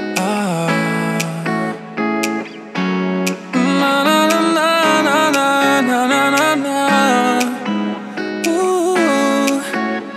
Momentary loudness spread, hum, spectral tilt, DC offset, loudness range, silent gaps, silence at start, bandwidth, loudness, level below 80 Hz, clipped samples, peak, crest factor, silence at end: 8 LU; none; -4 dB/octave; under 0.1%; 5 LU; none; 0 s; 16 kHz; -16 LUFS; -76 dBFS; under 0.1%; 0 dBFS; 16 dB; 0 s